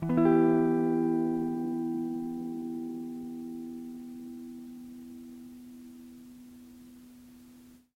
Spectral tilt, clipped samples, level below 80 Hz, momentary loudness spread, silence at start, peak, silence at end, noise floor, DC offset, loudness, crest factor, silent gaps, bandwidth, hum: -9 dB/octave; under 0.1%; -68 dBFS; 26 LU; 0 s; -12 dBFS; 0.2 s; -55 dBFS; under 0.1%; -30 LUFS; 20 dB; none; 15.5 kHz; none